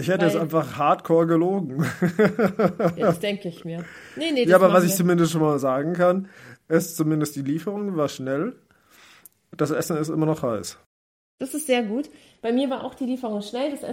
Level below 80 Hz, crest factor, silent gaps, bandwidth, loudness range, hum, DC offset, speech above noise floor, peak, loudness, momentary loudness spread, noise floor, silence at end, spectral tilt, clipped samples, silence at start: -66 dBFS; 20 dB; 10.86-11.38 s; 16.5 kHz; 7 LU; none; under 0.1%; 31 dB; -2 dBFS; -23 LUFS; 12 LU; -54 dBFS; 0 s; -6 dB/octave; under 0.1%; 0 s